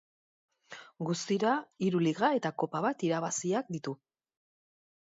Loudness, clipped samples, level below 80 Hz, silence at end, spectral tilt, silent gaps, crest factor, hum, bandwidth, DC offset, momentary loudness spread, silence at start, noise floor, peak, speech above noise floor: -32 LUFS; under 0.1%; -80 dBFS; 1.2 s; -5 dB/octave; none; 20 dB; none; 7.8 kHz; under 0.1%; 15 LU; 0.7 s; -52 dBFS; -14 dBFS; 21 dB